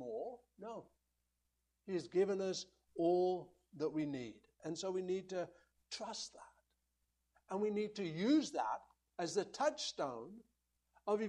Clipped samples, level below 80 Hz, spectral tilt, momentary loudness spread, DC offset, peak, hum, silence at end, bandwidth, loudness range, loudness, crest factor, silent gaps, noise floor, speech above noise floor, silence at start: under 0.1%; -80 dBFS; -5 dB/octave; 16 LU; under 0.1%; -24 dBFS; none; 0 s; 10.5 kHz; 5 LU; -40 LUFS; 18 dB; none; -85 dBFS; 46 dB; 0 s